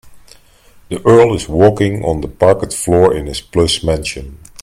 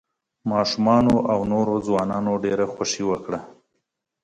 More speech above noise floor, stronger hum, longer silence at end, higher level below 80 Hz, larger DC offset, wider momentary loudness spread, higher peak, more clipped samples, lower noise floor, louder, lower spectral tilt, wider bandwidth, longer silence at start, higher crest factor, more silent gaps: second, 32 dB vs 56 dB; neither; second, 0.05 s vs 0.75 s; first, -34 dBFS vs -52 dBFS; neither; about the same, 12 LU vs 10 LU; first, 0 dBFS vs -4 dBFS; neither; second, -45 dBFS vs -77 dBFS; first, -13 LUFS vs -22 LUFS; about the same, -5.5 dB/octave vs -5.5 dB/octave; first, 15.5 kHz vs 11 kHz; second, 0.05 s vs 0.45 s; about the same, 14 dB vs 18 dB; neither